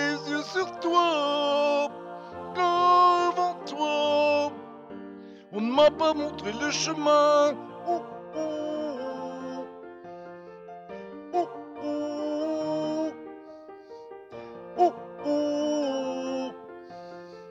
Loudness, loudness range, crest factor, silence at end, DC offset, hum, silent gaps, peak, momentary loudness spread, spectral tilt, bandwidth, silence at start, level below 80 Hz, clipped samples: -26 LUFS; 11 LU; 16 dB; 0 s; under 0.1%; none; none; -10 dBFS; 22 LU; -3.5 dB/octave; 8 kHz; 0 s; -68 dBFS; under 0.1%